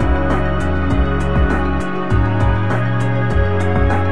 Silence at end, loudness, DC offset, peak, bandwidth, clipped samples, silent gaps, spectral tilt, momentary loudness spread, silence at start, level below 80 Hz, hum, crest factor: 0 s; -17 LUFS; 7%; -2 dBFS; 10 kHz; under 0.1%; none; -8 dB/octave; 2 LU; 0 s; -22 dBFS; none; 12 dB